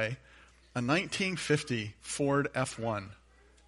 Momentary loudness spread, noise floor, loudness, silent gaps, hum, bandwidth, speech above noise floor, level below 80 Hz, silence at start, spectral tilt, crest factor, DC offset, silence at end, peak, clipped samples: 10 LU; -59 dBFS; -32 LUFS; none; none; 11.5 kHz; 27 dB; -62 dBFS; 0 s; -4.5 dB/octave; 20 dB; under 0.1%; 0.55 s; -14 dBFS; under 0.1%